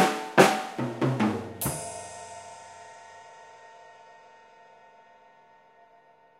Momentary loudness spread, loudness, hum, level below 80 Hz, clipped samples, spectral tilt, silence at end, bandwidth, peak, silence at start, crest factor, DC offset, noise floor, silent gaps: 28 LU; -26 LUFS; none; -62 dBFS; under 0.1%; -4.5 dB/octave; 2.7 s; 16 kHz; -2 dBFS; 0 s; 28 dB; under 0.1%; -58 dBFS; none